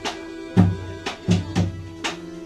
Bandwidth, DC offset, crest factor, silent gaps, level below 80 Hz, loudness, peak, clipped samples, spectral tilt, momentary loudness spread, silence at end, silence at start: 10.5 kHz; under 0.1%; 22 dB; none; -44 dBFS; -24 LUFS; -2 dBFS; under 0.1%; -6 dB/octave; 11 LU; 0 s; 0 s